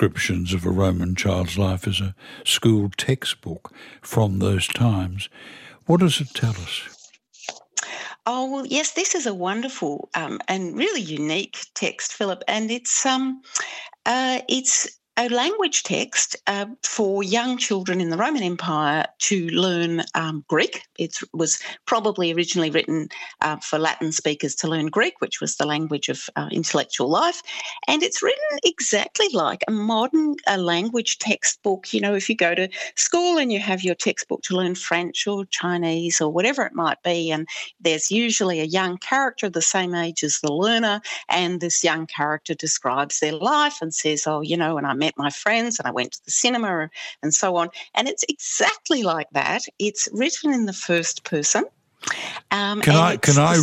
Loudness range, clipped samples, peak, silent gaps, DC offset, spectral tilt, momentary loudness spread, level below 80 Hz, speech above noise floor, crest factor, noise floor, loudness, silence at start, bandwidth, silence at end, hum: 3 LU; under 0.1%; -2 dBFS; none; under 0.1%; -3.5 dB/octave; 8 LU; -60 dBFS; 26 dB; 20 dB; -48 dBFS; -22 LUFS; 0 s; 16 kHz; 0 s; none